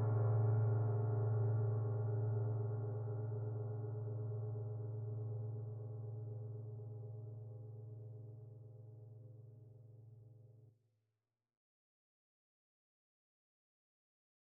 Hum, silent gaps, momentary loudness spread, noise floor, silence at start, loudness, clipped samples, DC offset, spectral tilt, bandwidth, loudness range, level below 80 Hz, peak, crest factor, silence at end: none; none; 22 LU; under -90 dBFS; 0 s; -41 LUFS; under 0.1%; under 0.1%; -10.5 dB/octave; 1.8 kHz; 21 LU; -80 dBFS; -26 dBFS; 16 dB; 3.8 s